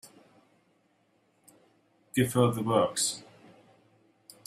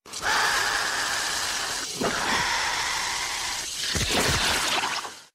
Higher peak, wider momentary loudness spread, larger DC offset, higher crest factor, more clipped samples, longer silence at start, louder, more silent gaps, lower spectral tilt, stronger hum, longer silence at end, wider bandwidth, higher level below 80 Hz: about the same, -10 dBFS vs -12 dBFS; about the same, 8 LU vs 6 LU; neither; first, 22 dB vs 14 dB; neither; about the same, 0.05 s vs 0.05 s; second, -27 LUFS vs -24 LUFS; neither; first, -4.5 dB/octave vs -1 dB/octave; neither; first, 1.25 s vs 0.1 s; about the same, 16 kHz vs 16 kHz; second, -68 dBFS vs -46 dBFS